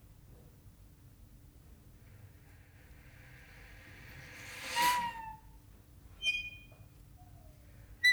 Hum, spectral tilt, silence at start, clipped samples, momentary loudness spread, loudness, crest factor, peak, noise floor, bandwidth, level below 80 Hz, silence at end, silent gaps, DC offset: none; -1 dB/octave; 0.1 s; under 0.1%; 28 LU; -35 LUFS; 24 dB; -18 dBFS; -58 dBFS; over 20 kHz; -60 dBFS; 0 s; none; under 0.1%